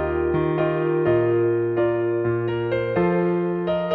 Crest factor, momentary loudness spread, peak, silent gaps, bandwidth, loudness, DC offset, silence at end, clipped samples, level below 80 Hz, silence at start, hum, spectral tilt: 12 dB; 4 LU; -8 dBFS; none; 4.6 kHz; -22 LUFS; under 0.1%; 0 s; under 0.1%; -46 dBFS; 0 s; none; -11 dB/octave